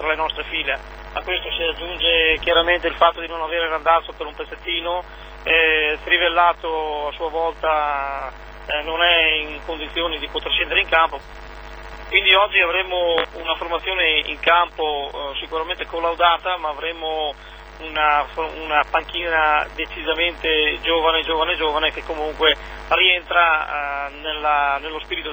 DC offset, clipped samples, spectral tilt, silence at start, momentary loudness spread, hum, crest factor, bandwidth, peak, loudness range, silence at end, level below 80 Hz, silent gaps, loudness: under 0.1%; under 0.1%; -4.5 dB/octave; 0 s; 12 LU; none; 20 dB; over 20 kHz; 0 dBFS; 3 LU; 0 s; -40 dBFS; none; -19 LUFS